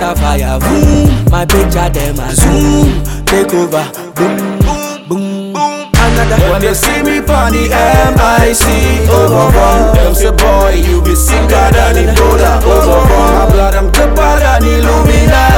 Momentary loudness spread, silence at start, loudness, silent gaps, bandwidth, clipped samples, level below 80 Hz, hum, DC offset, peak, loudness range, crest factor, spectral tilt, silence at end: 6 LU; 0 s; -9 LUFS; none; 17.5 kHz; 0.2%; -12 dBFS; none; under 0.1%; 0 dBFS; 4 LU; 8 dB; -5 dB/octave; 0 s